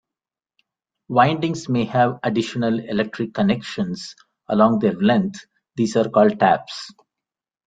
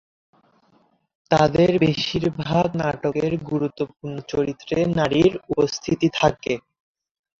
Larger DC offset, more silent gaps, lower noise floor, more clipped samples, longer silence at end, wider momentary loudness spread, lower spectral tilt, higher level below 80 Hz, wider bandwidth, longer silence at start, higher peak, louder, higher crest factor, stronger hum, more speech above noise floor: neither; neither; first, -89 dBFS vs -61 dBFS; neither; about the same, 0.75 s vs 0.8 s; first, 16 LU vs 10 LU; about the same, -6.5 dB/octave vs -6 dB/octave; second, -60 dBFS vs -48 dBFS; first, 9.2 kHz vs 7.8 kHz; second, 1.1 s vs 1.3 s; about the same, -2 dBFS vs -2 dBFS; about the same, -20 LUFS vs -21 LUFS; about the same, 18 dB vs 20 dB; neither; first, 70 dB vs 41 dB